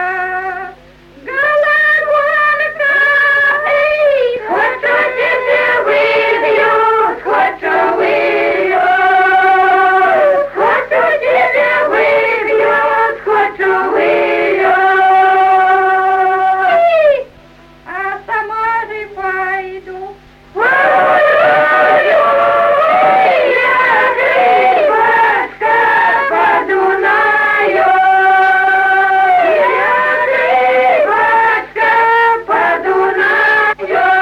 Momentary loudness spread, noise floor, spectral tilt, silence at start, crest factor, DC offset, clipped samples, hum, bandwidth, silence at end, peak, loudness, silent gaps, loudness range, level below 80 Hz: 6 LU; -40 dBFS; -4.5 dB/octave; 0 s; 10 dB; under 0.1%; under 0.1%; none; 13.5 kHz; 0 s; -2 dBFS; -11 LUFS; none; 3 LU; -50 dBFS